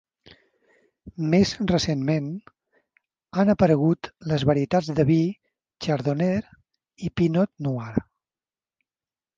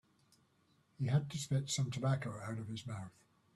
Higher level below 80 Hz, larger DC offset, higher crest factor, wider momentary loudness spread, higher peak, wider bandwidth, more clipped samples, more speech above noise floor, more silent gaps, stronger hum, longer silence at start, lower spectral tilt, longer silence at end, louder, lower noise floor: first, -50 dBFS vs -72 dBFS; neither; about the same, 18 dB vs 18 dB; about the same, 12 LU vs 11 LU; first, -6 dBFS vs -22 dBFS; second, 7.6 kHz vs 12.5 kHz; neither; first, over 68 dB vs 36 dB; neither; neither; about the same, 1.05 s vs 1 s; first, -7 dB/octave vs -5.5 dB/octave; first, 1.35 s vs 0.45 s; first, -24 LUFS vs -39 LUFS; first, under -90 dBFS vs -73 dBFS